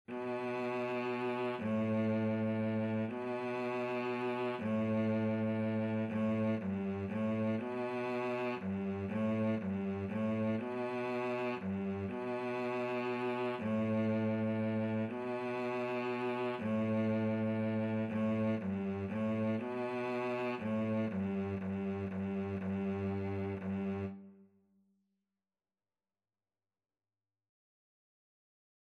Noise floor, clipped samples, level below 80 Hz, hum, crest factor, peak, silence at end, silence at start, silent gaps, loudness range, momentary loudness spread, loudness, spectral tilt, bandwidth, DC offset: under -90 dBFS; under 0.1%; -78 dBFS; none; 12 dB; -24 dBFS; 4.5 s; 0.1 s; none; 4 LU; 4 LU; -36 LUFS; -8.5 dB/octave; 6.6 kHz; under 0.1%